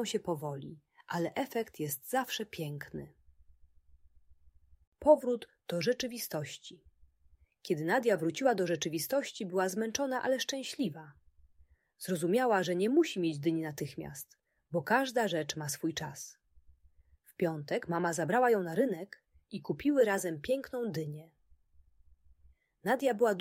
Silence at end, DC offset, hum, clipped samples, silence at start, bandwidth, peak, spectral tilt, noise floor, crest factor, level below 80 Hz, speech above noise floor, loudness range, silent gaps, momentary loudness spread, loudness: 0 s; under 0.1%; none; under 0.1%; 0 s; 16 kHz; -10 dBFS; -4.5 dB/octave; -66 dBFS; 24 dB; -68 dBFS; 34 dB; 5 LU; 4.87-4.92 s; 16 LU; -33 LUFS